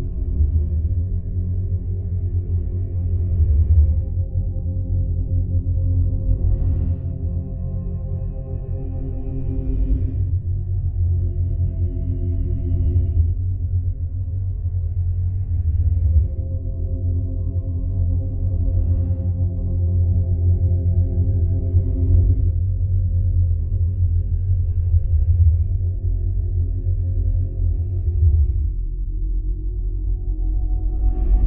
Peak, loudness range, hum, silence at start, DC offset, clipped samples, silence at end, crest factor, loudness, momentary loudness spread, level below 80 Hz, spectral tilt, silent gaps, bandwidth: -6 dBFS; 4 LU; none; 0 s; under 0.1%; under 0.1%; 0 s; 14 dB; -22 LUFS; 8 LU; -22 dBFS; -15 dB/octave; none; 1.1 kHz